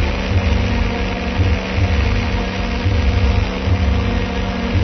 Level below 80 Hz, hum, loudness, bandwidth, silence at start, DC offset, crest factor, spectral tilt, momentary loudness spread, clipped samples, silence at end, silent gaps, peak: -20 dBFS; none; -18 LUFS; 6.4 kHz; 0 s; under 0.1%; 12 dB; -6.5 dB/octave; 4 LU; under 0.1%; 0 s; none; -4 dBFS